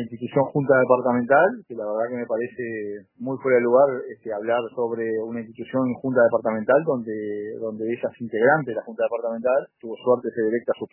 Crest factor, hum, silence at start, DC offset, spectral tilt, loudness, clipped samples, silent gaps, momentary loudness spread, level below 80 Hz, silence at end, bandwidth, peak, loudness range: 20 dB; none; 0 s; under 0.1%; -11.5 dB/octave; -23 LUFS; under 0.1%; none; 12 LU; -72 dBFS; 0.05 s; 3.1 kHz; -2 dBFS; 2 LU